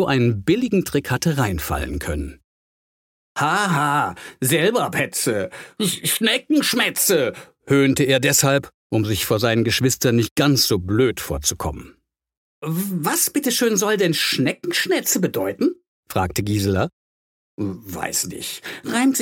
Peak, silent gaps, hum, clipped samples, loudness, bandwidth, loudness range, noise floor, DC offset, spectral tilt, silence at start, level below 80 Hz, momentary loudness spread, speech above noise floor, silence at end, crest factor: -2 dBFS; 2.44-3.35 s, 8.74-8.90 s, 10.31-10.36 s, 12.37-12.62 s, 15.88-16.03 s, 16.93-17.58 s; none; under 0.1%; -20 LUFS; 17 kHz; 5 LU; under -90 dBFS; under 0.1%; -4 dB/octave; 0 s; -42 dBFS; 11 LU; over 70 dB; 0 s; 18 dB